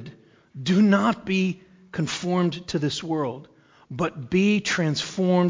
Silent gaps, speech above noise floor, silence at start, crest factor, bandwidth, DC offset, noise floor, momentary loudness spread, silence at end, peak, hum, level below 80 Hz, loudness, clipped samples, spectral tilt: none; 24 dB; 0 s; 16 dB; 7.6 kHz; under 0.1%; -46 dBFS; 14 LU; 0 s; -8 dBFS; none; -58 dBFS; -24 LUFS; under 0.1%; -5.5 dB/octave